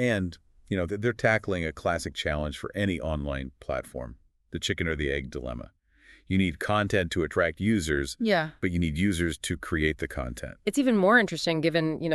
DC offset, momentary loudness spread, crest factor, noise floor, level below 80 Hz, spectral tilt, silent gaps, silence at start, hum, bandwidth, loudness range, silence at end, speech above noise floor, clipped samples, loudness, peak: under 0.1%; 10 LU; 20 dB; -58 dBFS; -44 dBFS; -5.5 dB/octave; none; 0 s; none; 13.5 kHz; 6 LU; 0 s; 30 dB; under 0.1%; -28 LUFS; -8 dBFS